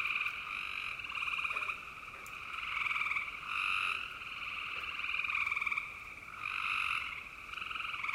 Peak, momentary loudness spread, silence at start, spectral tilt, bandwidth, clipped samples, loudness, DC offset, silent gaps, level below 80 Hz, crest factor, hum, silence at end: -22 dBFS; 11 LU; 0 s; -1 dB/octave; 16 kHz; under 0.1%; -36 LUFS; under 0.1%; none; -64 dBFS; 16 dB; none; 0 s